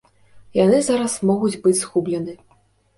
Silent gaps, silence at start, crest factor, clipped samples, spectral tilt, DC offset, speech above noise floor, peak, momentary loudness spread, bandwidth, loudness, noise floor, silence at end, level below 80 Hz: none; 0.35 s; 16 dB; under 0.1%; -5 dB/octave; under 0.1%; 40 dB; -4 dBFS; 10 LU; 11.5 kHz; -19 LUFS; -59 dBFS; 0.6 s; -58 dBFS